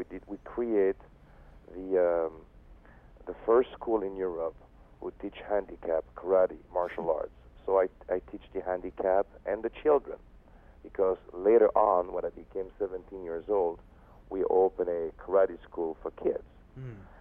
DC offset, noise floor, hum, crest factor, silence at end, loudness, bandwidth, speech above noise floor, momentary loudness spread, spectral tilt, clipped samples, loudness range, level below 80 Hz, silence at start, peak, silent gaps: under 0.1%; -54 dBFS; none; 20 dB; 0.15 s; -30 LUFS; 3.7 kHz; 25 dB; 16 LU; -9 dB/octave; under 0.1%; 4 LU; -56 dBFS; 0 s; -12 dBFS; none